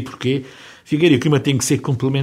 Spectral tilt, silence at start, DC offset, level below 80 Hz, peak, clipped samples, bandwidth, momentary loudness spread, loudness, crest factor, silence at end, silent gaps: -5.5 dB/octave; 0 s; under 0.1%; -54 dBFS; -2 dBFS; under 0.1%; 16 kHz; 10 LU; -18 LUFS; 16 dB; 0 s; none